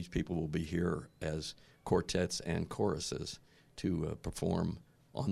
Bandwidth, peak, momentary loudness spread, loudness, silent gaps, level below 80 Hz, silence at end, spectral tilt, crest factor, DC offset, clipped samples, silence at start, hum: 13.5 kHz; -16 dBFS; 11 LU; -37 LUFS; none; -52 dBFS; 0 s; -5.5 dB/octave; 22 dB; under 0.1%; under 0.1%; 0 s; none